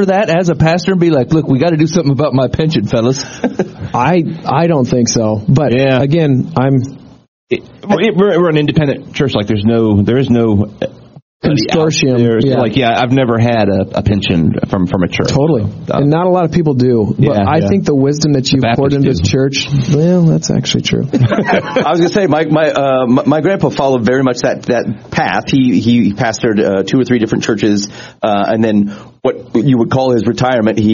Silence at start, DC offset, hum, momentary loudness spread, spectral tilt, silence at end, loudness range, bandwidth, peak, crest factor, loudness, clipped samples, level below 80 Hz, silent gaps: 0 s; under 0.1%; none; 5 LU; -6 dB/octave; 0 s; 2 LU; 7.4 kHz; 0 dBFS; 12 dB; -12 LUFS; under 0.1%; -38 dBFS; 7.28-7.47 s, 11.22-11.40 s